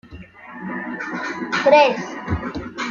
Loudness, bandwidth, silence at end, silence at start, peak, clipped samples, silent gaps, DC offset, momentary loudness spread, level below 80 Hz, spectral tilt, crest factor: -20 LUFS; 7.4 kHz; 0 s; 0.05 s; -2 dBFS; under 0.1%; none; under 0.1%; 19 LU; -44 dBFS; -5 dB/octave; 20 dB